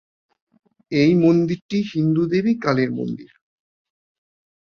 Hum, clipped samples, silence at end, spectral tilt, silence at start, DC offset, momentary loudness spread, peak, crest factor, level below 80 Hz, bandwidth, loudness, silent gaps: none; under 0.1%; 1.45 s; -8 dB/octave; 0.9 s; under 0.1%; 11 LU; -4 dBFS; 18 dB; -60 dBFS; 6.8 kHz; -19 LUFS; 1.62-1.69 s